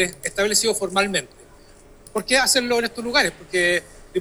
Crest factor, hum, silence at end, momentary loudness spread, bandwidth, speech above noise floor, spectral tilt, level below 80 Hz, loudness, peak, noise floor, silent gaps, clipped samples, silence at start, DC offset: 18 dB; none; 0 s; 9 LU; over 20 kHz; 26 dB; -1.5 dB/octave; -48 dBFS; -20 LUFS; -4 dBFS; -48 dBFS; none; under 0.1%; 0 s; under 0.1%